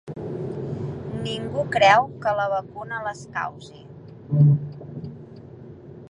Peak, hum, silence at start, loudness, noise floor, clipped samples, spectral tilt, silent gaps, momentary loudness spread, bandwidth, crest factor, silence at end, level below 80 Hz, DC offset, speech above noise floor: -2 dBFS; none; 0.05 s; -23 LUFS; -42 dBFS; under 0.1%; -6.5 dB/octave; none; 25 LU; 10 kHz; 22 dB; 0.05 s; -54 dBFS; under 0.1%; 21 dB